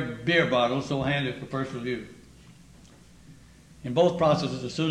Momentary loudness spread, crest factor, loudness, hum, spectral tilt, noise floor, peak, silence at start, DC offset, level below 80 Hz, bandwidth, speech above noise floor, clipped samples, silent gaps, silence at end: 11 LU; 18 dB; -26 LUFS; none; -6 dB/octave; -52 dBFS; -10 dBFS; 0 s; under 0.1%; -56 dBFS; 11.5 kHz; 26 dB; under 0.1%; none; 0 s